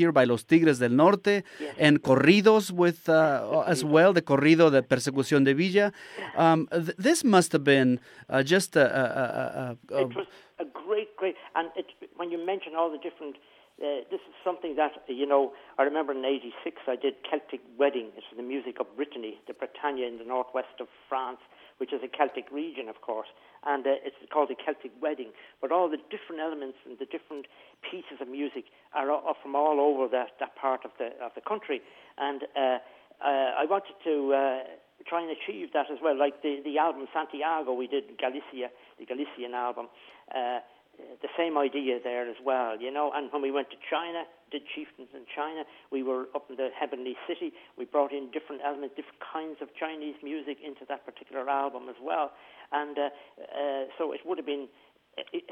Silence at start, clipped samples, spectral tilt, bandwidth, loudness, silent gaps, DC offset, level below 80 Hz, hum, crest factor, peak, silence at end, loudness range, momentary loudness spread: 0 s; under 0.1%; -5.5 dB/octave; 15.5 kHz; -28 LUFS; none; under 0.1%; -78 dBFS; none; 22 dB; -6 dBFS; 0 s; 12 LU; 18 LU